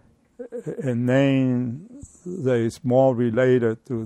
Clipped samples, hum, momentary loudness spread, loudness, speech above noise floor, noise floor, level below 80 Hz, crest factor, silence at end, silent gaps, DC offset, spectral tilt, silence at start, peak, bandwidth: under 0.1%; none; 17 LU; -21 LUFS; 21 dB; -42 dBFS; -60 dBFS; 16 dB; 0 s; none; under 0.1%; -8 dB/octave; 0.4 s; -6 dBFS; 11.5 kHz